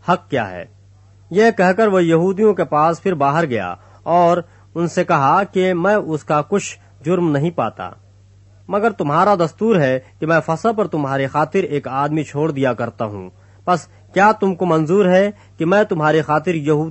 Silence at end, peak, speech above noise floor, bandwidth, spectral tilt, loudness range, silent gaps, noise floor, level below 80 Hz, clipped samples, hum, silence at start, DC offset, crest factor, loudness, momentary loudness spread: 0 s; -2 dBFS; 31 dB; 8.4 kHz; -6.5 dB/octave; 4 LU; none; -47 dBFS; -56 dBFS; under 0.1%; none; 0.05 s; under 0.1%; 16 dB; -17 LUFS; 9 LU